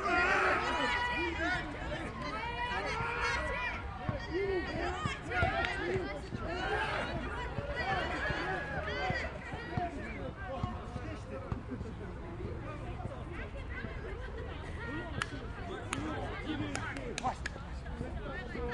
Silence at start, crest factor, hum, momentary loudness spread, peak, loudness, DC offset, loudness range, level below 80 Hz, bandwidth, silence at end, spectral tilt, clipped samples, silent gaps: 0 s; 24 dB; none; 11 LU; -14 dBFS; -36 LUFS; under 0.1%; 8 LU; -46 dBFS; 11.5 kHz; 0 s; -5 dB/octave; under 0.1%; none